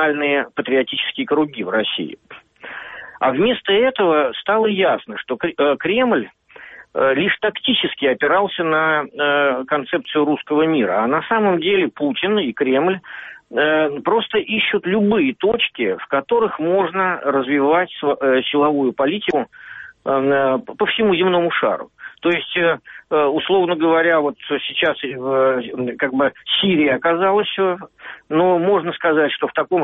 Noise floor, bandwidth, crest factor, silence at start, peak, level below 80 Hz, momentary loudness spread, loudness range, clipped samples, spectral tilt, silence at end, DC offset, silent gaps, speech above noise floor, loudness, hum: -41 dBFS; 4 kHz; 12 dB; 0 s; -6 dBFS; -60 dBFS; 8 LU; 1 LU; under 0.1%; -2.5 dB/octave; 0 s; under 0.1%; none; 23 dB; -18 LUFS; none